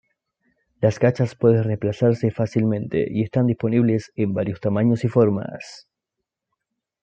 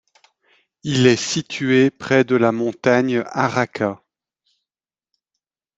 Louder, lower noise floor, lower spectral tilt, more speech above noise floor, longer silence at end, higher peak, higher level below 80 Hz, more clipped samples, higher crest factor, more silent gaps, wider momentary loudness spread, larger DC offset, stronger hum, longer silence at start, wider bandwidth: second, -21 LUFS vs -18 LUFS; second, -83 dBFS vs under -90 dBFS; first, -8.5 dB/octave vs -5 dB/octave; second, 63 dB vs over 72 dB; second, 1.25 s vs 1.8 s; about the same, -4 dBFS vs -2 dBFS; about the same, -58 dBFS vs -60 dBFS; neither; about the same, 18 dB vs 18 dB; neither; about the same, 6 LU vs 8 LU; neither; neither; about the same, 0.8 s vs 0.85 s; about the same, 8 kHz vs 8 kHz